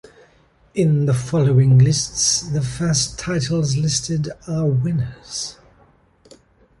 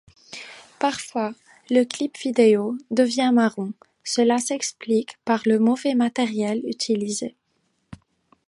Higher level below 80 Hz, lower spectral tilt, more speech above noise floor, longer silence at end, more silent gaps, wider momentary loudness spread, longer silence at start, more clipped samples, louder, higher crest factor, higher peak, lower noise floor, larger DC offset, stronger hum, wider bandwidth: first, -44 dBFS vs -66 dBFS; about the same, -5 dB/octave vs -4 dB/octave; second, 37 dB vs 49 dB; first, 1.25 s vs 0.55 s; neither; about the same, 13 LU vs 14 LU; first, 0.75 s vs 0.3 s; neither; first, -19 LUFS vs -22 LUFS; about the same, 16 dB vs 18 dB; about the same, -4 dBFS vs -4 dBFS; second, -55 dBFS vs -70 dBFS; neither; neither; about the same, 11.5 kHz vs 11.5 kHz